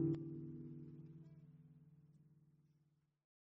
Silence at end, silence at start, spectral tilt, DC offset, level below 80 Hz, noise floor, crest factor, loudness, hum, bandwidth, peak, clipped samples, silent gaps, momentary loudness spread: 1.05 s; 0 s; -12 dB/octave; under 0.1%; -78 dBFS; -80 dBFS; 22 dB; -50 LUFS; none; 5.4 kHz; -28 dBFS; under 0.1%; none; 22 LU